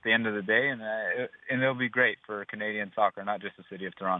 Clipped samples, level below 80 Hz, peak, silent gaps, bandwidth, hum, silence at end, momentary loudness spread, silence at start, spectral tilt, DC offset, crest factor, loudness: under 0.1%; -76 dBFS; -10 dBFS; none; 4 kHz; none; 0 s; 12 LU; 0.05 s; -8.5 dB/octave; under 0.1%; 20 dB; -29 LUFS